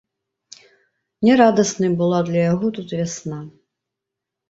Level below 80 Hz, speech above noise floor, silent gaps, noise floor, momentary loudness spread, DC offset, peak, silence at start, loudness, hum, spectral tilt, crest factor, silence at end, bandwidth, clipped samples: -60 dBFS; 66 dB; none; -83 dBFS; 14 LU; under 0.1%; -2 dBFS; 1.2 s; -18 LUFS; none; -6 dB/octave; 20 dB; 1 s; 8 kHz; under 0.1%